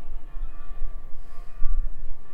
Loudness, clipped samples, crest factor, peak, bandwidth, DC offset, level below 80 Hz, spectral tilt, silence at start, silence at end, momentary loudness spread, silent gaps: -39 LUFS; under 0.1%; 14 dB; -4 dBFS; 1.9 kHz; under 0.1%; -28 dBFS; -7.5 dB/octave; 0 s; 0 s; 13 LU; none